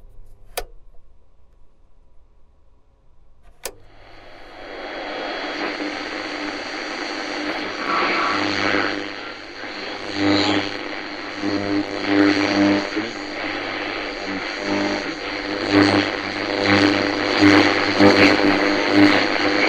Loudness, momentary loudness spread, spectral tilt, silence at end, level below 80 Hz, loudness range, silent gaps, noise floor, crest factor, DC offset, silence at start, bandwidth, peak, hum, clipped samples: -19 LUFS; 16 LU; -4.5 dB/octave; 0 s; -48 dBFS; 16 LU; none; -52 dBFS; 22 dB; under 0.1%; 0 s; 16 kHz; 0 dBFS; none; under 0.1%